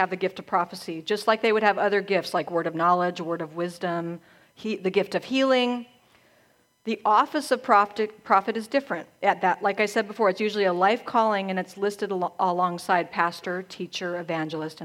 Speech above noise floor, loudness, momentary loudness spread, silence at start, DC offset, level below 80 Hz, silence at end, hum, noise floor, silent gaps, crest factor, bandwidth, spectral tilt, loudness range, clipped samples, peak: 38 dB; -25 LUFS; 10 LU; 0 s; under 0.1%; -76 dBFS; 0 s; none; -63 dBFS; none; 20 dB; 16 kHz; -5 dB/octave; 4 LU; under 0.1%; -4 dBFS